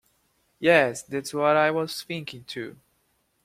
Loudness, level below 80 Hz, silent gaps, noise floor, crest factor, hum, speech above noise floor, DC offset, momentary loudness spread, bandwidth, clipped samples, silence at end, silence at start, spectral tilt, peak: -24 LUFS; -68 dBFS; none; -70 dBFS; 22 dB; none; 46 dB; under 0.1%; 16 LU; 16 kHz; under 0.1%; 0.75 s; 0.6 s; -4.5 dB/octave; -4 dBFS